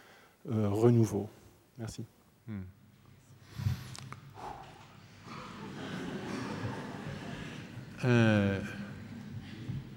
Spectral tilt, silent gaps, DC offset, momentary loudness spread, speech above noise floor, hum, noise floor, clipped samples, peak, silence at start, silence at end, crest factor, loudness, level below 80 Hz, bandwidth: -7 dB/octave; none; under 0.1%; 22 LU; 30 dB; none; -59 dBFS; under 0.1%; -12 dBFS; 0.05 s; 0 s; 22 dB; -34 LUFS; -62 dBFS; 16.5 kHz